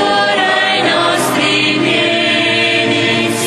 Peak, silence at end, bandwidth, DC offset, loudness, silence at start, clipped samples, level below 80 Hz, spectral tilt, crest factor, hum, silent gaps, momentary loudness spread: -2 dBFS; 0 s; 13 kHz; under 0.1%; -11 LUFS; 0 s; under 0.1%; -52 dBFS; -3 dB/octave; 10 dB; none; none; 1 LU